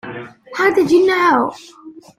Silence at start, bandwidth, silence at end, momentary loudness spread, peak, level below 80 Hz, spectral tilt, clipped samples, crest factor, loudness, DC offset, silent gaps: 0.05 s; 14.5 kHz; 0.25 s; 18 LU; -2 dBFS; -60 dBFS; -5 dB/octave; under 0.1%; 14 dB; -14 LUFS; under 0.1%; none